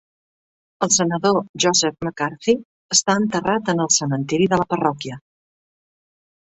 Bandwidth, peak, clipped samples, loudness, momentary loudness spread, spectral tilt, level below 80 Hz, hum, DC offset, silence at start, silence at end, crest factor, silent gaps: 8.4 kHz; -2 dBFS; under 0.1%; -19 LUFS; 8 LU; -3.5 dB/octave; -58 dBFS; none; under 0.1%; 0.8 s; 1.3 s; 20 dB; 1.49-1.54 s, 2.65-2.89 s